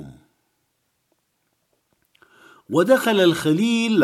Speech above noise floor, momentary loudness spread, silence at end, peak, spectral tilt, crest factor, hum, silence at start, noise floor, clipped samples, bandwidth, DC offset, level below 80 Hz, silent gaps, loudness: 54 dB; 5 LU; 0 s; -4 dBFS; -5 dB/octave; 18 dB; none; 0 s; -71 dBFS; under 0.1%; 15.5 kHz; under 0.1%; -66 dBFS; none; -18 LUFS